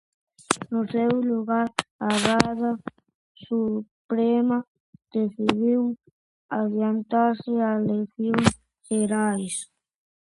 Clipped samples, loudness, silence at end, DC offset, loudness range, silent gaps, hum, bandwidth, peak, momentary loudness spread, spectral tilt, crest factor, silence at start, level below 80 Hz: under 0.1%; -25 LUFS; 0.6 s; under 0.1%; 1 LU; 1.91-1.99 s, 3.15-3.35 s, 3.91-4.09 s, 4.67-4.93 s, 6.12-6.49 s; none; 11.5 kHz; 0 dBFS; 10 LU; -5 dB/octave; 24 dB; 0.5 s; -56 dBFS